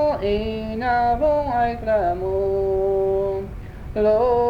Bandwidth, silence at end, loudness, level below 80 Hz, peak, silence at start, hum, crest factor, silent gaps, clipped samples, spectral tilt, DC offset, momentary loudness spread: 6.6 kHz; 0 s; -21 LUFS; -36 dBFS; -8 dBFS; 0 s; none; 12 dB; none; under 0.1%; -8 dB/octave; under 0.1%; 8 LU